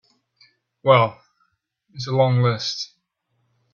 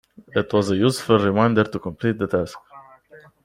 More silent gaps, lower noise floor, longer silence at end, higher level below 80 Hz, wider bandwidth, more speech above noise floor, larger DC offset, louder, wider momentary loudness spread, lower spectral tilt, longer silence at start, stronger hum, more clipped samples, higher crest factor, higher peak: neither; first, -71 dBFS vs -49 dBFS; first, 0.9 s vs 0.3 s; about the same, -60 dBFS vs -56 dBFS; second, 7 kHz vs 15.5 kHz; first, 53 dB vs 29 dB; neither; about the same, -20 LUFS vs -21 LUFS; first, 15 LU vs 8 LU; about the same, -6 dB/octave vs -6.5 dB/octave; first, 0.85 s vs 0.35 s; neither; neither; about the same, 22 dB vs 20 dB; about the same, 0 dBFS vs -2 dBFS